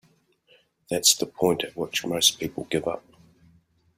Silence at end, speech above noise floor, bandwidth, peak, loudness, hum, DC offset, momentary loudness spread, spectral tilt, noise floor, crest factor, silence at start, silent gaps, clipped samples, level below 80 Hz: 1 s; 38 dB; 16 kHz; -4 dBFS; -23 LUFS; none; under 0.1%; 13 LU; -2 dB/octave; -63 dBFS; 24 dB; 0.9 s; none; under 0.1%; -62 dBFS